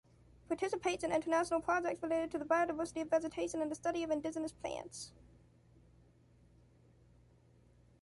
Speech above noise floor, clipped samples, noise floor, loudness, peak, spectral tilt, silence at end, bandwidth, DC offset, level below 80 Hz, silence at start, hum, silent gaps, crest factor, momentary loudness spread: 29 dB; under 0.1%; -66 dBFS; -37 LUFS; -20 dBFS; -4 dB/octave; 2.9 s; 11.5 kHz; under 0.1%; -66 dBFS; 0.5 s; none; none; 18 dB; 10 LU